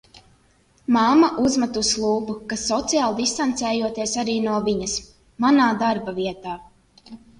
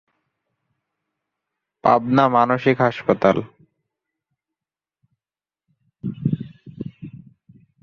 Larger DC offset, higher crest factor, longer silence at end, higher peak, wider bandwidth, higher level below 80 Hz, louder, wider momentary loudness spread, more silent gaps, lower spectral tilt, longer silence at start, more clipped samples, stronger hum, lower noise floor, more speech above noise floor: neither; second, 16 dB vs 22 dB; second, 0.25 s vs 0.65 s; second, -6 dBFS vs -2 dBFS; first, 11.5 kHz vs 6.8 kHz; first, -52 dBFS vs -58 dBFS; about the same, -21 LUFS vs -19 LUFS; second, 11 LU vs 19 LU; neither; second, -3.5 dB/octave vs -8 dB/octave; second, 0.9 s vs 1.85 s; neither; neither; second, -59 dBFS vs under -90 dBFS; second, 38 dB vs over 73 dB